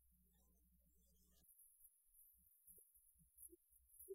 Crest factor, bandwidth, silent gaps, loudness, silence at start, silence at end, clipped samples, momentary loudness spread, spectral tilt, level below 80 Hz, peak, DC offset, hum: 24 dB; 16 kHz; none; -66 LUFS; 0 s; 0 s; under 0.1%; 6 LU; -4 dB/octave; -82 dBFS; -46 dBFS; under 0.1%; none